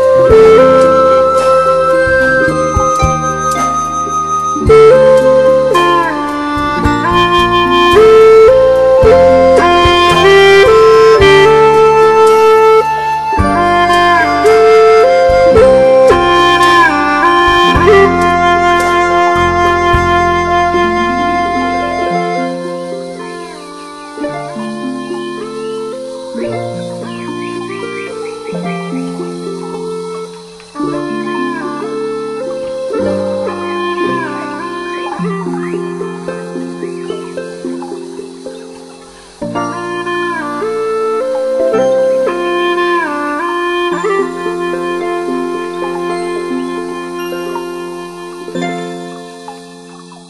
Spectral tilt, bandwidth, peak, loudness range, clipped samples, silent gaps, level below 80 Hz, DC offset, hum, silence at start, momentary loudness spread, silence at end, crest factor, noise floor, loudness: -5 dB/octave; 12.5 kHz; 0 dBFS; 15 LU; 0.7%; none; -32 dBFS; under 0.1%; none; 0 s; 17 LU; 0.05 s; 10 dB; -35 dBFS; -10 LUFS